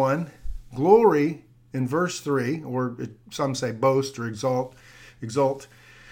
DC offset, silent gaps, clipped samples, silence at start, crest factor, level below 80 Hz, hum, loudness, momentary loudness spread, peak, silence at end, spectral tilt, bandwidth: under 0.1%; none; under 0.1%; 0 s; 20 dB; -46 dBFS; none; -24 LUFS; 18 LU; -4 dBFS; 0 s; -6 dB/octave; 16.5 kHz